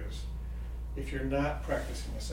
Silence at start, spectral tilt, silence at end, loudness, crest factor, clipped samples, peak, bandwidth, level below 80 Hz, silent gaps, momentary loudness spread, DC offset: 0 s; -6 dB/octave; 0 s; -36 LUFS; 16 dB; under 0.1%; -18 dBFS; 16 kHz; -38 dBFS; none; 9 LU; under 0.1%